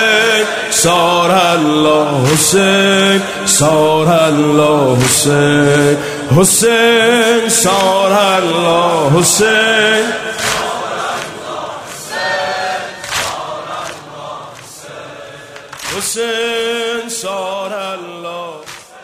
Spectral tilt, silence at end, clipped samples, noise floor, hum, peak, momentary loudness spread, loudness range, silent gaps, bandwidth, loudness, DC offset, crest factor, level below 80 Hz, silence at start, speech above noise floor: -3.5 dB/octave; 0 s; under 0.1%; -32 dBFS; none; 0 dBFS; 18 LU; 11 LU; none; 16 kHz; -11 LUFS; under 0.1%; 12 dB; -48 dBFS; 0 s; 22 dB